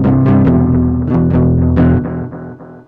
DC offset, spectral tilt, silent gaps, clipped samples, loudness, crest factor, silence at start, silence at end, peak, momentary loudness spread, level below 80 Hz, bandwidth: under 0.1%; -12.5 dB/octave; none; under 0.1%; -12 LUFS; 10 dB; 0 s; 0.1 s; -2 dBFS; 15 LU; -24 dBFS; 3.9 kHz